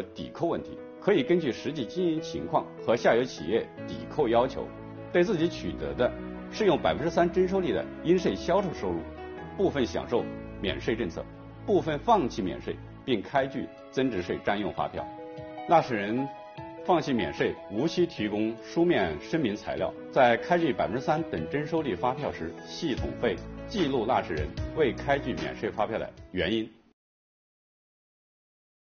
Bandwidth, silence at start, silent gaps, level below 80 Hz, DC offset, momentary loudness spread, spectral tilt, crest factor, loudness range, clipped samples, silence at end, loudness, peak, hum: 6.8 kHz; 0 s; none; -50 dBFS; under 0.1%; 13 LU; -4.5 dB/octave; 20 dB; 4 LU; under 0.1%; 2.1 s; -29 LUFS; -8 dBFS; none